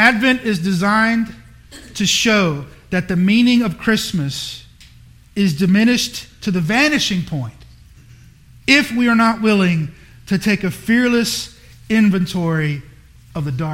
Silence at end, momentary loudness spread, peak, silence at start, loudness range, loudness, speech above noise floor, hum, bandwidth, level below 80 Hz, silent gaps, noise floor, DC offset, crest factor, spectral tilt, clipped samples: 0 s; 13 LU; 0 dBFS; 0 s; 2 LU; -16 LUFS; 28 dB; none; 16.5 kHz; -46 dBFS; none; -44 dBFS; under 0.1%; 18 dB; -4.5 dB/octave; under 0.1%